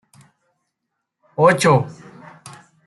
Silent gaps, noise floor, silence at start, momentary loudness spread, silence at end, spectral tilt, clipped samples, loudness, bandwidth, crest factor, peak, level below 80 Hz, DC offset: none; -78 dBFS; 1.4 s; 20 LU; 0.95 s; -5.5 dB/octave; under 0.1%; -16 LUFS; 12 kHz; 20 dB; -2 dBFS; -60 dBFS; under 0.1%